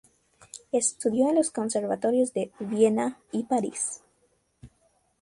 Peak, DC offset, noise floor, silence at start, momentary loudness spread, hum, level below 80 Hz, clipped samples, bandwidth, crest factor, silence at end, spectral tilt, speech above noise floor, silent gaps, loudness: -10 dBFS; under 0.1%; -69 dBFS; 0.55 s; 9 LU; none; -68 dBFS; under 0.1%; 11.5 kHz; 18 dB; 0.55 s; -4.5 dB/octave; 43 dB; none; -26 LUFS